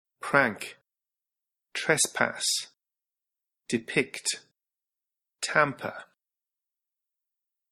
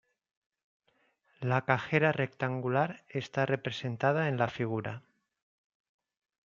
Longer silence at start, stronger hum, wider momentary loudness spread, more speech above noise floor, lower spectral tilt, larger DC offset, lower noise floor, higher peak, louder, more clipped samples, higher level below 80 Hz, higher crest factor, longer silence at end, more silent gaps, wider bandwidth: second, 0.2 s vs 1.4 s; neither; first, 14 LU vs 9 LU; first, over 63 dB vs 42 dB; second, -2 dB/octave vs -7 dB/octave; neither; first, under -90 dBFS vs -73 dBFS; about the same, -6 dBFS vs -8 dBFS; first, -27 LUFS vs -31 LUFS; neither; about the same, -76 dBFS vs -72 dBFS; about the same, 26 dB vs 26 dB; first, 1.7 s vs 1.55 s; neither; first, 15.5 kHz vs 7.4 kHz